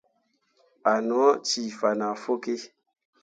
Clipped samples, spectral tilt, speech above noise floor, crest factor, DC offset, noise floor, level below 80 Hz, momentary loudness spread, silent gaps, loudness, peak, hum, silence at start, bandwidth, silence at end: under 0.1%; -3 dB/octave; 47 dB; 20 dB; under 0.1%; -71 dBFS; -78 dBFS; 11 LU; none; -26 LUFS; -8 dBFS; none; 0.85 s; 9.2 kHz; 0.55 s